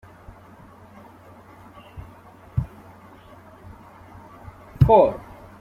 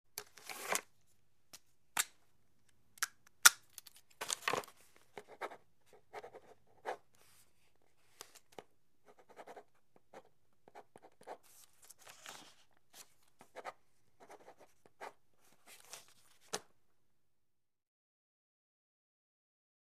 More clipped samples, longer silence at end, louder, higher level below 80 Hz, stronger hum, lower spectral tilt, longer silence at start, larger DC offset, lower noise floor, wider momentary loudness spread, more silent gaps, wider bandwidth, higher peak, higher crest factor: neither; second, 0.4 s vs 3.3 s; first, -19 LUFS vs -36 LUFS; first, -42 dBFS vs -88 dBFS; neither; first, -9.5 dB/octave vs 1.5 dB/octave; first, 1.95 s vs 0.15 s; neither; second, -47 dBFS vs -83 dBFS; first, 30 LU vs 22 LU; neither; second, 13.5 kHz vs 15.5 kHz; about the same, -2 dBFS vs -4 dBFS; second, 24 dB vs 42 dB